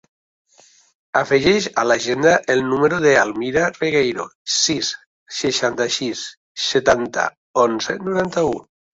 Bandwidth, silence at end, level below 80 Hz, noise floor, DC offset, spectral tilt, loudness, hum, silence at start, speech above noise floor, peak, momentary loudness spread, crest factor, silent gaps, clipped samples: 8 kHz; 0.35 s; -52 dBFS; -53 dBFS; under 0.1%; -3 dB/octave; -18 LUFS; none; 1.15 s; 35 dB; 0 dBFS; 9 LU; 18 dB; 4.35-4.45 s, 5.06-5.26 s, 6.37-6.55 s, 7.37-7.54 s; under 0.1%